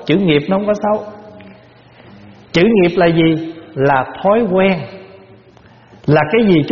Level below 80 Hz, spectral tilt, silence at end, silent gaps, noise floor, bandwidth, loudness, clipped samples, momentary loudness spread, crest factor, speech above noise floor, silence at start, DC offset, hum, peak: -46 dBFS; -5.5 dB/octave; 0 s; none; -44 dBFS; 7 kHz; -14 LUFS; under 0.1%; 10 LU; 16 dB; 31 dB; 0 s; under 0.1%; none; 0 dBFS